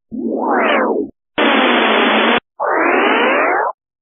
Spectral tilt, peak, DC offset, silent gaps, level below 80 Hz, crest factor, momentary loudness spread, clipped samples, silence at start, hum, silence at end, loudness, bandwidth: -0.5 dB/octave; 0 dBFS; under 0.1%; none; -60 dBFS; 14 dB; 9 LU; under 0.1%; 0.1 s; none; 0.3 s; -14 LUFS; 3.9 kHz